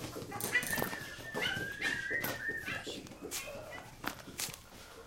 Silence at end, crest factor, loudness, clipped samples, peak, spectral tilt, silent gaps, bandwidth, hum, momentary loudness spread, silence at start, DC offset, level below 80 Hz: 0 s; 24 dB; -37 LUFS; under 0.1%; -16 dBFS; -2.5 dB/octave; none; 17 kHz; none; 12 LU; 0 s; under 0.1%; -60 dBFS